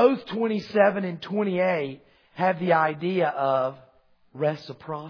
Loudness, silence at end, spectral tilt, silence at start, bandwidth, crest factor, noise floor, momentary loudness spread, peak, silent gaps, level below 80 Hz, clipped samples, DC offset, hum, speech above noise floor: -25 LUFS; 0 s; -8 dB/octave; 0 s; 5.4 kHz; 20 dB; -60 dBFS; 10 LU; -6 dBFS; none; -72 dBFS; under 0.1%; under 0.1%; none; 35 dB